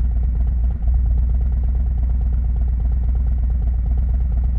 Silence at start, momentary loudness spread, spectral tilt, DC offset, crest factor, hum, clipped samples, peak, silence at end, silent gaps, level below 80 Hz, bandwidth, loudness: 0 s; 1 LU; -12 dB/octave; under 0.1%; 8 dB; none; under 0.1%; -8 dBFS; 0 s; none; -18 dBFS; 2 kHz; -21 LUFS